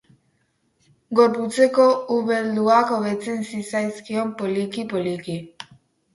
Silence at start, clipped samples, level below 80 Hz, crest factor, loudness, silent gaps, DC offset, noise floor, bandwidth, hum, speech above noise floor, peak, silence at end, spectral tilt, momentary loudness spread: 1.1 s; under 0.1%; -68 dBFS; 18 dB; -21 LUFS; none; under 0.1%; -68 dBFS; 11.5 kHz; none; 47 dB; -4 dBFS; 0.5 s; -5.5 dB/octave; 13 LU